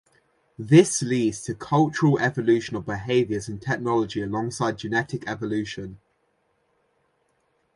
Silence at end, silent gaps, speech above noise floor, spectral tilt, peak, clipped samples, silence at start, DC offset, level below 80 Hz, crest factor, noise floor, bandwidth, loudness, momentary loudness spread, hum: 1.8 s; none; 46 dB; -5.5 dB/octave; -2 dBFS; under 0.1%; 0.6 s; under 0.1%; -56 dBFS; 22 dB; -69 dBFS; 11.5 kHz; -23 LUFS; 13 LU; none